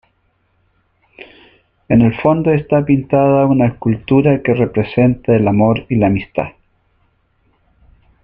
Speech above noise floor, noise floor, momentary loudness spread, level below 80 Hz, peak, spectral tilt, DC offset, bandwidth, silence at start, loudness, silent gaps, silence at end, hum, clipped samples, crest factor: 48 dB; -61 dBFS; 5 LU; -42 dBFS; -2 dBFS; -11 dB/octave; under 0.1%; 4.7 kHz; 1.9 s; -14 LUFS; none; 1.75 s; none; under 0.1%; 14 dB